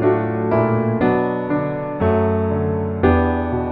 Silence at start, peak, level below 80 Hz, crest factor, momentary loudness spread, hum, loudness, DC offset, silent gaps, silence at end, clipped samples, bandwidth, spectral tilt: 0 s; -2 dBFS; -34 dBFS; 16 dB; 5 LU; none; -19 LUFS; under 0.1%; none; 0 s; under 0.1%; 4.7 kHz; -11.5 dB/octave